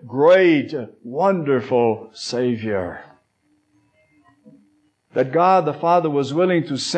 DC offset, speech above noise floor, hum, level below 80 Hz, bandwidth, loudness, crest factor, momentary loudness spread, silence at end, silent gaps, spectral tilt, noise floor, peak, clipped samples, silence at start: under 0.1%; 46 dB; none; -66 dBFS; 9.2 kHz; -19 LUFS; 16 dB; 14 LU; 0 s; none; -6 dB/octave; -64 dBFS; -4 dBFS; under 0.1%; 0 s